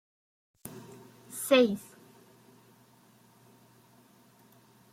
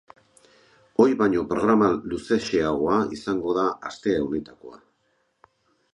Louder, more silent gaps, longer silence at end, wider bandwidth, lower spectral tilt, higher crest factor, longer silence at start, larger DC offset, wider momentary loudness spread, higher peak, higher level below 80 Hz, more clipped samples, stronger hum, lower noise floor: second, -27 LUFS vs -23 LUFS; neither; first, 3.1 s vs 1.15 s; first, 16 kHz vs 11 kHz; second, -4 dB/octave vs -6.5 dB/octave; about the same, 24 dB vs 20 dB; second, 0.65 s vs 1 s; neither; first, 28 LU vs 10 LU; second, -10 dBFS vs -4 dBFS; second, -80 dBFS vs -54 dBFS; neither; neither; second, -61 dBFS vs -70 dBFS